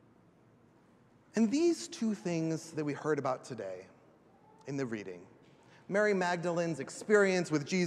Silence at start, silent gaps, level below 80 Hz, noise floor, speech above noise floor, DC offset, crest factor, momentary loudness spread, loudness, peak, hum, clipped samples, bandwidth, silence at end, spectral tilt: 1.35 s; none; -82 dBFS; -64 dBFS; 32 dB; under 0.1%; 20 dB; 14 LU; -33 LUFS; -14 dBFS; none; under 0.1%; 12.5 kHz; 0 s; -5.5 dB/octave